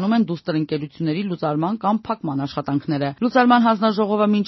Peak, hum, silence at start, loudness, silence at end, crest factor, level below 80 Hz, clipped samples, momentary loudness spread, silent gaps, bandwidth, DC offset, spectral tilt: -2 dBFS; none; 0 s; -20 LUFS; 0 s; 18 dB; -60 dBFS; under 0.1%; 9 LU; none; 6 kHz; under 0.1%; -5.5 dB/octave